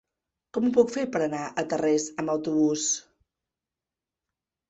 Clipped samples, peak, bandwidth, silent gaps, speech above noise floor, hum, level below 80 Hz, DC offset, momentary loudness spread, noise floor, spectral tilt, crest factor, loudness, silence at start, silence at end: under 0.1%; -8 dBFS; 8.2 kHz; none; 64 dB; none; -68 dBFS; under 0.1%; 7 LU; -90 dBFS; -4 dB/octave; 20 dB; -26 LUFS; 0.55 s; 1.7 s